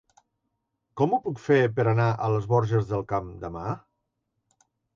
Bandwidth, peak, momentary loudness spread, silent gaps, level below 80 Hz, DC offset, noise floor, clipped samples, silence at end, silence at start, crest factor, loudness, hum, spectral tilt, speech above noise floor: 7.2 kHz; -10 dBFS; 12 LU; none; -54 dBFS; under 0.1%; -79 dBFS; under 0.1%; 1.2 s; 0.95 s; 16 dB; -25 LUFS; none; -8.5 dB/octave; 55 dB